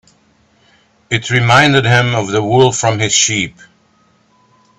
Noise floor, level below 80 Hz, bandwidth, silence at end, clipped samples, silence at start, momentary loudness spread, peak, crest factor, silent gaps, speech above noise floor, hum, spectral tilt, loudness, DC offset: -54 dBFS; -48 dBFS; 8.8 kHz; 1.3 s; under 0.1%; 1.1 s; 10 LU; 0 dBFS; 14 dB; none; 42 dB; none; -3.5 dB/octave; -12 LUFS; under 0.1%